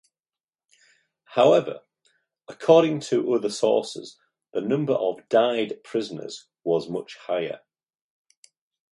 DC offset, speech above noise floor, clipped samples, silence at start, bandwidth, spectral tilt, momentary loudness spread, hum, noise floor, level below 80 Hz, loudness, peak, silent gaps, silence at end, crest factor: under 0.1%; over 67 dB; under 0.1%; 1.3 s; 11.5 kHz; -5.5 dB/octave; 17 LU; none; under -90 dBFS; -74 dBFS; -23 LUFS; -2 dBFS; none; 1.35 s; 22 dB